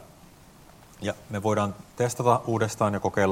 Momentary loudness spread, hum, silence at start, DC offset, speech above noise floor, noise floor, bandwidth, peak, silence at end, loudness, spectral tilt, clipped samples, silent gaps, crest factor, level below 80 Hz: 10 LU; none; 0 s; under 0.1%; 26 dB; -51 dBFS; 16.5 kHz; -6 dBFS; 0 s; -27 LUFS; -6 dB/octave; under 0.1%; none; 22 dB; -60 dBFS